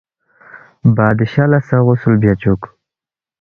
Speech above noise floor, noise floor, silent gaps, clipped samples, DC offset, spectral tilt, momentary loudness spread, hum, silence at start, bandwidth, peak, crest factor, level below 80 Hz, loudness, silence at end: 77 dB; -89 dBFS; none; under 0.1%; under 0.1%; -10.5 dB/octave; 5 LU; none; 0.55 s; 5 kHz; 0 dBFS; 14 dB; -40 dBFS; -14 LUFS; 0.75 s